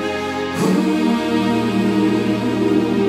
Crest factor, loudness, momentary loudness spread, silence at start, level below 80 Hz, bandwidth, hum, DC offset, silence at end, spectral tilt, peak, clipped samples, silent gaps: 12 dB; -18 LUFS; 4 LU; 0 s; -50 dBFS; 15 kHz; none; under 0.1%; 0 s; -6 dB/octave; -4 dBFS; under 0.1%; none